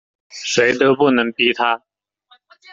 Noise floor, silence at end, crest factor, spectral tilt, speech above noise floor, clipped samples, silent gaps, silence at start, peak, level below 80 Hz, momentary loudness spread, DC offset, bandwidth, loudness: -56 dBFS; 0.95 s; 16 dB; -3.5 dB/octave; 40 dB; under 0.1%; none; 0.35 s; -2 dBFS; -60 dBFS; 12 LU; under 0.1%; 8 kHz; -16 LUFS